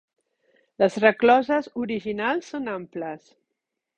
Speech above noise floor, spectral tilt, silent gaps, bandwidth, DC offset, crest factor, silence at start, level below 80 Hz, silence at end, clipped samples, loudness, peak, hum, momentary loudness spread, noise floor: 59 dB; -5.5 dB/octave; none; 9 kHz; under 0.1%; 20 dB; 0.8 s; -66 dBFS; 0.8 s; under 0.1%; -23 LUFS; -4 dBFS; none; 15 LU; -82 dBFS